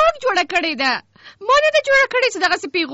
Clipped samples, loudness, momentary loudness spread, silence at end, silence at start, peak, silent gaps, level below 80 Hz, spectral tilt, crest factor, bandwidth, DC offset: under 0.1%; -16 LUFS; 6 LU; 0 s; 0 s; -6 dBFS; none; -50 dBFS; 1.5 dB/octave; 12 dB; 8 kHz; under 0.1%